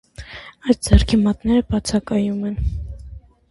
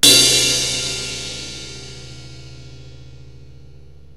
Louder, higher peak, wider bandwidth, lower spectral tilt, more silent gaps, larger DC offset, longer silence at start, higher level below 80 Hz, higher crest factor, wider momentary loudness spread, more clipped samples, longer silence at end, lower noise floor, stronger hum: second, -19 LUFS vs -15 LUFS; about the same, 0 dBFS vs 0 dBFS; second, 11.5 kHz vs 16 kHz; first, -6 dB/octave vs -0.5 dB/octave; neither; second, under 0.1% vs 0.9%; first, 0.2 s vs 0.05 s; first, -26 dBFS vs -44 dBFS; about the same, 20 dB vs 20 dB; second, 20 LU vs 28 LU; neither; second, 0.3 s vs 0.7 s; second, -39 dBFS vs -44 dBFS; neither